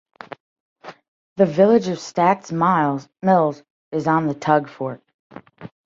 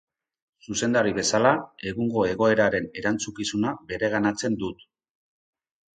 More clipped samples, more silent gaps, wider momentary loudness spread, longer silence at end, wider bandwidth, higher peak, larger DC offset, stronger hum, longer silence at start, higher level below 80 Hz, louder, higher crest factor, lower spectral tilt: neither; first, 0.40-0.76 s, 1.08-1.36 s, 3.70-3.91 s, 5.14-5.30 s vs none; first, 23 LU vs 8 LU; second, 0.2 s vs 1.25 s; second, 7.8 kHz vs 9.4 kHz; about the same, -2 dBFS vs -4 dBFS; neither; neither; second, 0.3 s vs 0.7 s; second, -64 dBFS vs -56 dBFS; first, -19 LUFS vs -25 LUFS; about the same, 18 dB vs 22 dB; first, -7 dB/octave vs -4 dB/octave